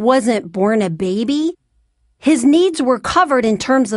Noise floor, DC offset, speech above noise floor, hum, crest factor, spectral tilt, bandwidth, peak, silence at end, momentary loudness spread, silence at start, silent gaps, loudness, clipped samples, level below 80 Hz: -61 dBFS; under 0.1%; 46 dB; none; 14 dB; -5 dB/octave; 11.5 kHz; -2 dBFS; 0 s; 7 LU; 0 s; none; -16 LUFS; under 0.1%; -50 dBFS